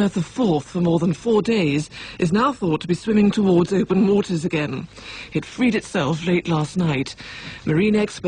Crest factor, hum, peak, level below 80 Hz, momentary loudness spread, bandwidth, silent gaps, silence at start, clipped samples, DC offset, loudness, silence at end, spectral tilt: 14 dB; none; -6 dBFS; -50 dBFS; 10 LU; 10 kHz; none; 0 s; under 0.1%; under 0.1%; -20 LUFS; 0 s; -6.5 dB/octave